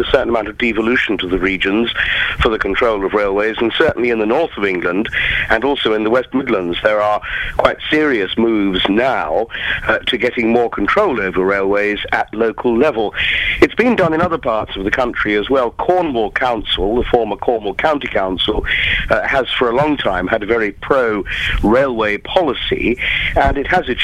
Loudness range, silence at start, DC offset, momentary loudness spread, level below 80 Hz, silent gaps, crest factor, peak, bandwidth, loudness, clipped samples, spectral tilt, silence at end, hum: 1 LU; 0 s; under 0.1%; 4 LU; -32 dBFS; none; 16 dB; 0 dBFS; 12.5 kHz; -15 LUFS; under 0.1%; -6 dB/octave; 0 s; none